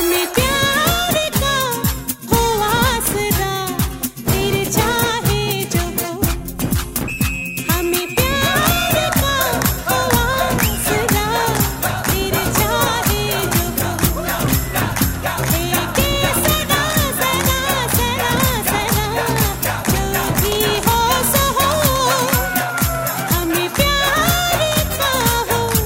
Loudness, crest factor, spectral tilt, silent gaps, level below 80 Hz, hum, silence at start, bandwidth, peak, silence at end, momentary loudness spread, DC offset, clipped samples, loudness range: -17 LUFS; 18 dB; -3.5 dB/octave; none; -28 dBFS; none; 0 s; 16.5 kHz; 0 dBFS; 0 s; 5 LU; under 0.1%; under 0.1%; 3 LU